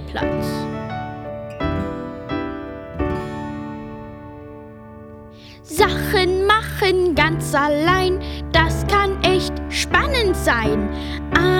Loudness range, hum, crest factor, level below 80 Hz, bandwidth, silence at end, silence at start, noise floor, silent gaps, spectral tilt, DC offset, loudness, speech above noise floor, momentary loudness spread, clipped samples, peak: 12 LU; none; 20 dB; -32 dBFS; 17.5 kHz; 0 s; 0 s; -40 dBFS; none; -5 dB/octave; under 0.1%; -20 LUFS; 22 dB; 20 LU; under 0.1%; 0 dBFS